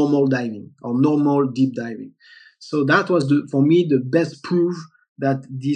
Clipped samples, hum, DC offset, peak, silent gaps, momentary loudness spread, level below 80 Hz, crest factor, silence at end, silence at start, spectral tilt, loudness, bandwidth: under 0.1%; none; under 0.1%; -2 dBFS; 5.09-5.16 s; 13 LU; -80 dBFS; 16 dB; 0 s; 0 s; -7.5 dB/octave; -19 LUFS; 9.2 kHz